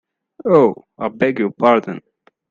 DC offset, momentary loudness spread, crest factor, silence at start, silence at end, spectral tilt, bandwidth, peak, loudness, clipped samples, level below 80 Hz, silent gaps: under 0.1%; 14 LU; 18 dB; 0.45 s; 0.5 s; -8 dB/octave; 7.2 kHz; 0 dBFS; -17 LUFS; under 0.1%; -62 dBFS; none